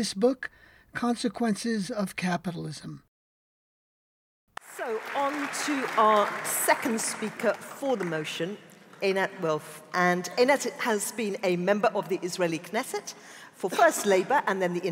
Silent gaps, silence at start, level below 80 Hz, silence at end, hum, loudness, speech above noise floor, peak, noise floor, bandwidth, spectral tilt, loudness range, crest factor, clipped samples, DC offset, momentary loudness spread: 3.08-4.47 s; 0 s; -72 dBFS; 0 s; none; -27 LUFS; over 63 dB; -8 dBFS; under -90 dBFS; 16.5 kHz; -4 dB/octave; 8 LU; 20 dB; under 0.1%; under 0.1%; 13 LU